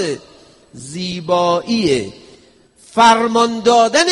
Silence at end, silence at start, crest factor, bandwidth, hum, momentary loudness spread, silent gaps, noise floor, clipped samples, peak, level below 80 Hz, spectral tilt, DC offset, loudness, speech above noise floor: 0 s; 0 s; 16 dB; 11.5 kHz; none; 18 LU; none; -49 dBFS; under 0.1%; 0 dBFS; -54 dBFS; -3.5 dB/octave; under 0.1%; -15 LUFS; 34 dB